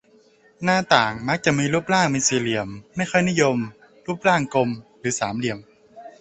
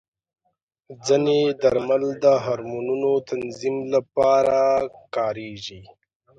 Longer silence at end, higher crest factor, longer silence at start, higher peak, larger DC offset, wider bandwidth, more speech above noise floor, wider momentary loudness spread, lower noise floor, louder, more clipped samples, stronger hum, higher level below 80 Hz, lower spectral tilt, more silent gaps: second, 0.1 s vs 0.55 s; about the same, 22 dB vs 18 dB; second, 0.6 s vs 0.9 s; first, -2 dBFS vs -6 dBFS; neither; about the same, 8.6 kHz vs 9 kHz; second, 34 dB vs 53 dB; about the same, 11 LU vs 12 LU; second, -55 dBFS vs -74 dBFS; about the same, -21 LUFS vs -22 LUFS; neither; neither; about the same, -56 dBFS vs -58 dBFS; second, -4 dB/octave vs -5.5 dB/octave; neither